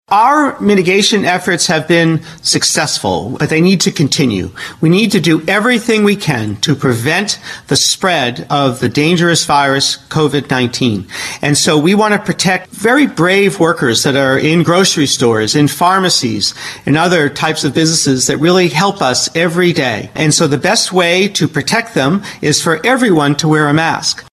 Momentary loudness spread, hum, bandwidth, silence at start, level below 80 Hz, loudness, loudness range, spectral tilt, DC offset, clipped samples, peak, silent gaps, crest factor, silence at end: 5 LU; none; 13 kHz; 0.1 s; -48 dBFS; -12 LUFS; 2 LU; -4 dB/octave; under 0.1%; under 0.1%; 0 dBFS; none; 12 dB; 0.1 s